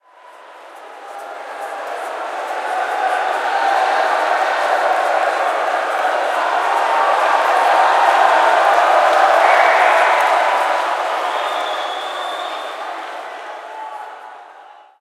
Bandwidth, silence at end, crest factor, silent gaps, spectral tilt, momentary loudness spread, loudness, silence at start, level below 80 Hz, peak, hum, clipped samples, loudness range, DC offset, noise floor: 15.5 kHz; 0.3 s; 16 dB; none; 1 dB/octave; 18 LU; -16 LUFS; 0.25 s; -82 dBFS; 0 dBFS; none; under 0.1%; 11 LU; under 0.1%; -42 dBFS